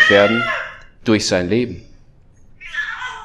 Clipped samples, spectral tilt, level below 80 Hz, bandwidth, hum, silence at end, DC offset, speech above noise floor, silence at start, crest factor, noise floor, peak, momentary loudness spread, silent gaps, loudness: under 0.1%; -4 dB/octave; -46 dBFS; 12.5 kHz; none; 0 s; under 0.1%; 31 dB; 0 s; 18 dB; -46 dBFS; 0 dBFS; 17 LU; none; -18 LUFS